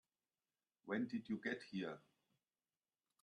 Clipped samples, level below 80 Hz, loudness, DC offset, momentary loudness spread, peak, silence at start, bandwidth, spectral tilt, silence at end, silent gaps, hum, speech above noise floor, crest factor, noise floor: under 0.1%; -88 dBFS; -46 LUFS; under 0.1%; 12 LU; -30 dBFS; 0.85 s; 10 kHz; -6.5 dB/octave; 1.25 s; none; none; over 45 dB; 20 dB; under -90 dBFS